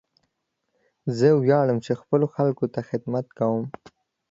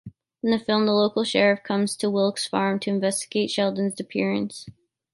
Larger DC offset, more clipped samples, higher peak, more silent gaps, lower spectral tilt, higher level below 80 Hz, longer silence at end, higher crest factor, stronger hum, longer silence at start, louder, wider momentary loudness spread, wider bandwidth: neither; neither; about the same, -6 dBFS vs -4 dBFS; neither; first, -8.5 dB/octave vs -4.5 dB/octave; about the same, -66 dBFS vs -66 dBFS; first, 0.6 s vs 0.45 s; about the same, 18 dB vs 20 dB; neither; first, 1.05 s vs 0.05 s; about the same, -23 LUFS vs -23 LUFS; first, 11 LU vs 7 LU; second, 7.8 kHz vs 12 kHz